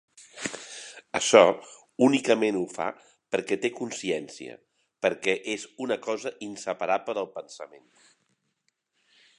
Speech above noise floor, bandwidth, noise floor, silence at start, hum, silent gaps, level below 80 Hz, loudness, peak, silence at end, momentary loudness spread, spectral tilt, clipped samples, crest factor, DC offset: 50 dB; 11 kHz; -76 dBFS; 0.2 s; none; none; -72 dBFS; -26 LUFS; -2 dBFS; 1.7 s; 20 LU; -3.5 dB/octave; under 0.1%; 26 dB; under 0.1%